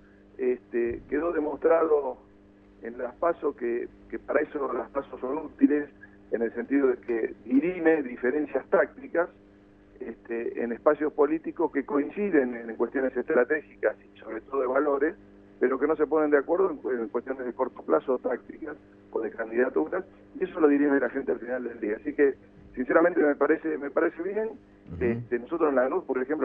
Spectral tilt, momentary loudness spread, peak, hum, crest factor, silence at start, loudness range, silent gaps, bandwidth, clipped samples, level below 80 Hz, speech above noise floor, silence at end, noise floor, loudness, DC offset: -10 dB/octave; 12 LU; -8 dBFS; 50 Hz at -60 dBFS; 20 dB; 0.4 s; 3 LU; none; 3.7 kHz; under 0.1%; -60 dBFS; 28 dB; 0 s; -55 dBFS; -27 LUFS; under 0.1%